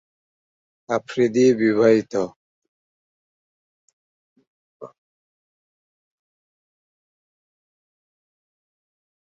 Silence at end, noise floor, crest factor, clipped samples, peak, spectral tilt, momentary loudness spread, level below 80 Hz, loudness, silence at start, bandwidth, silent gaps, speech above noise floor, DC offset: 4.4 s; under -90 dBFS; 22 dB; under 0.1%; -4 dBFS; -6 dB/octave; 10 LU; -68 dBFS; -19 LUFS; 0.9 s; 7.8 kHz; 2.36-2.62 s, 2.68-4.36 s, 4.47-4.80 s; over 72 dB; under 0.1%